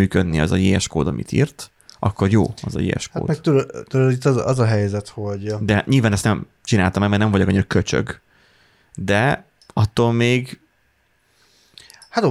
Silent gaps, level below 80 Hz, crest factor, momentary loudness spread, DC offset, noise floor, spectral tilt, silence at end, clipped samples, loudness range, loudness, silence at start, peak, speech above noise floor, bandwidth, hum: none; -42 dBFS; 16 dB; 10 LU; under 0.1%; -63 dBFS; -6 dB/octave; 0 s; under 0.1%; 3 LU; -19 LUFS; 0 s; -4 dBFS; 44 dB; 13 kHz; none